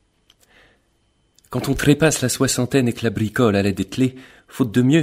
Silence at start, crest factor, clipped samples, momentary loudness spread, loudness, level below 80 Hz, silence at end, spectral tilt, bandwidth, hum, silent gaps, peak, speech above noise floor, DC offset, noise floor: 1.5 s; 18 dB; under 0.1%; 8 LU; -19 LUFS; -44 dBFS; 0 s; -5 dB/octave; 16 kHz; none; none; -2 dBFS; 45 dB; under 0.1%; -63 dBFS